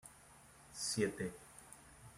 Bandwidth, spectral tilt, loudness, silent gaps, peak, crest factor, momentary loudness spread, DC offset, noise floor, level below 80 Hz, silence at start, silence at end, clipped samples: 16 kHz; -3.5 dB/octave; -40 LUFS; none; -22 dBFS; 22 dB; 23 LU; under 0.1%; -62 dBFS; -70 dBFS; 0.05 s; 0 s; under 0.1%